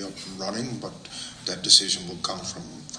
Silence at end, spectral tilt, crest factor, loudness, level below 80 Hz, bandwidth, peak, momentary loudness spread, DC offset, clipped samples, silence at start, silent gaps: 0 s; -1.5 dB/octave; 26 dB; -23 LUFS; -60 dBFS; 10.5 kHz; -2 dBFS; 20 LU; under 0.1%; under 0.1%; 0 s; none